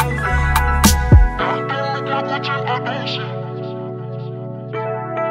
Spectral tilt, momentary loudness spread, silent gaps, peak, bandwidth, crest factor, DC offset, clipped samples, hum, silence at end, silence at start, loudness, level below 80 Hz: -5 dB/octave; 15 LU; none; 0 dBFS; 16 kHz; 18 dB; under 0.1%; under 0.1%; none; 0 s; 0 s; -19 LUFS; -22 dBFS